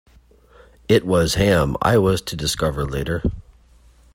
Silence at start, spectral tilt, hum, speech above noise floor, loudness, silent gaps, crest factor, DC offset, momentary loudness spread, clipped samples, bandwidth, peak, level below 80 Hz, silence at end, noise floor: 0.9 s; -5.5 dB/octave; none; 33 dB; -19 LUFS; none; 18 dB; under 0.1%; 9 LU; under 0.1%; 16.5 kHz; -2 dBFS; -36 dBFS; 0.75 s; -51 dBFS